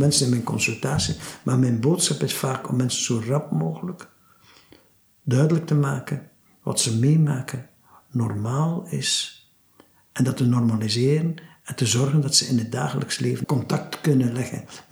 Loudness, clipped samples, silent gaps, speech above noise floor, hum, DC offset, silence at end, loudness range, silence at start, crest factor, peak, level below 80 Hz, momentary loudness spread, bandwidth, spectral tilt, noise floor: -23 LUFS; under 0.1%; none; 34 dB; none; under 0.1%; 0.1 s; 4 LU; 0 s; 18 dB; -6 dBFS; -58 dBFS; 14 LU; over 20 kHz; -5 dB/octave; -56 dBFS